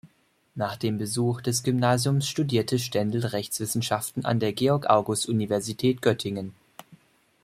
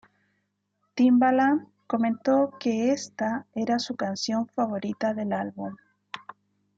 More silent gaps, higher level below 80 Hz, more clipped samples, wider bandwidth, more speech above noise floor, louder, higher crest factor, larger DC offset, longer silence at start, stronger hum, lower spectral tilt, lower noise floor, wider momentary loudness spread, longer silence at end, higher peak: neither; first, -62 dBFS vs -76 dBFS; neither; first, 16 kHz vs 7.8 kHz; second, 40 dB vs 51 dB; about the same, -26 LUFS vs -26 LUFS; first, 22 dB vs 16 dB; neither; second, 0.05 s vs 0.95 s; second, none vs 50 Hz at -50 dBFS; about the same, -5 dB/octave vs -5 dB/octave; second, -65 dBFS vs -76 dBFS; second, 7 LU vs 17 LU; about the same, 0.5 s vs 0.6 s; first, -4 dBFS vs -10 dBFS